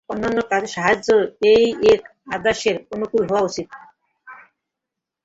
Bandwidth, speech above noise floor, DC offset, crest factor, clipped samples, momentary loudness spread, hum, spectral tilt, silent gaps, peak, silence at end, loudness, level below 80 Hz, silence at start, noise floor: 8 kHz; 65 dB; under 0.1%; 18 dB; under 0.1%; 10 LU; none; -4.5 dB/octave; none; -2 dBFS; 0.9 s; -19 LUFS; -52 dBFS; 0.1 s; -84 dBFS